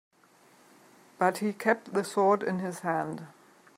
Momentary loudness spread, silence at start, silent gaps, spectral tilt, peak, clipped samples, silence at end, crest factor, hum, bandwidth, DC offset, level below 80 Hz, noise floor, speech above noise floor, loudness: 11 LU; 1.2 s; none; -5.5 dB/octave; -10 dBFS; under 0.1%; 0.45 s; 22 dB; none; 16 kHz; under 0.1%; -80 dBFS; -61 dBFS; 32 dB; -29 LUFS